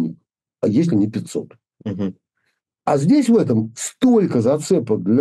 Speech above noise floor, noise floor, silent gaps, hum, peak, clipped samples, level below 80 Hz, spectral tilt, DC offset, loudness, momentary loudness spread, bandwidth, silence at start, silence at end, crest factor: 54 dB; -71 dBFS; none; none; -6 dBFS; under 0.1%; -62 dBFS; -7 dB/octave; under 0.1%; -18 LUFS; 13 LU; 12.5 kHz; 0 s; 0 s; 12 dB